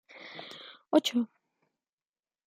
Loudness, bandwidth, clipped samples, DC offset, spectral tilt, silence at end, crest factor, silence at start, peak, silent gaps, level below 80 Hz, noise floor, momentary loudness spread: -29 LUFS; 16 kHz; under 0.1%; under 0.1%; -3.5 dB/octave; 1.2 s; 24 dB; 0.15 s; -10 dBFS; none; -88 dBFS; under -90 dBFS; 19 LU